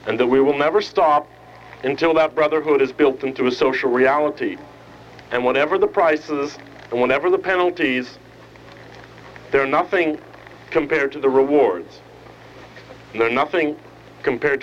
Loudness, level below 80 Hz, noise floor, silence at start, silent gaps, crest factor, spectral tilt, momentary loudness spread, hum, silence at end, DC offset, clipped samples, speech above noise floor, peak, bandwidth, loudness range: -19 LUFS; -54 dBFS; -43 dBFS; 0.05 s; none; 16 dB; -6 dB/octave; 12 LU; none; 0 s; under 0.1%; under 0.1%; 24 dB; -4 dBFS; 7.6 kHz; 4 LU